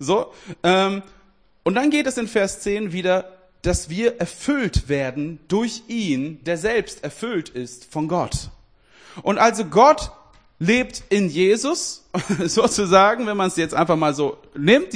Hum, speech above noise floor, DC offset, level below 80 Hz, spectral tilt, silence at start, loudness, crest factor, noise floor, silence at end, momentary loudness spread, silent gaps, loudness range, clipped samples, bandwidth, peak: none; 37 dB; under 0.1%; -40 dBFS; -4.5 dB/octave; 0 s; -20 LUFS; 20 dB; -57 dBFS; 0 s; 12 LU; none; 6 LU; under 0.1%; 10.5 kHz; 0 dBFS